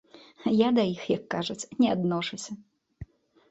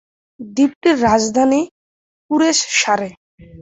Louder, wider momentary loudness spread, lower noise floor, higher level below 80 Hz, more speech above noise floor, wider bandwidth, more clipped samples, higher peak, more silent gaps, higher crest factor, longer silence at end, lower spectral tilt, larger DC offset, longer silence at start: second, -27 LUFS vs -16 LUFS; first, 24 LU vs 10 LU; second, -47 dBFS vs under -90 dBFS; second, -60 dBFS vs -48 dBFS; second, 21 dB vs over 75 dB; about the same, 8.2 kHz vs 8.4 kHz; neither; second, -10 dBFS vs -2 dBFS; second, none vs 0.75-0.81 s, 1.71-2.29 s, 3.17-3.38 s; about the same, 18 dB vs 16 dB; first, 0.45 s vs 0 s; first, -5.5 dB/octave vs -3 dB/octave; neither; about the same, 0.4 s vs 0.4 s